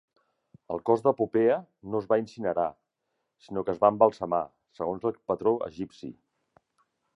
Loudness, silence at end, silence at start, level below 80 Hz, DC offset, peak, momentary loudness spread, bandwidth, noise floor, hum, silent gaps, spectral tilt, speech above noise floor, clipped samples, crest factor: -28 LUFS; 1.05 s; 0.7 s; -66 dBFS; under 0.1%; -6 dBFS; 13 LU; 7.8 kHz; -81 dBFS; none; none; -8 dB/octave; 54 dB; under 0.1%; 24 dB